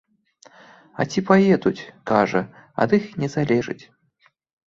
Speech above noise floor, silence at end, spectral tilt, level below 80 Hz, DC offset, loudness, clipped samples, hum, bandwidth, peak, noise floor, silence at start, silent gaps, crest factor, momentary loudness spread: 42 dB; 0.9 s; -7 dB/octave; -58 dBFS; under 0.1%; -21 LUFS; under 0.1%; none; 7.6 kHz; -2 dBFS; -63 dBFS; 1 s; none; 20 dB; 16 LU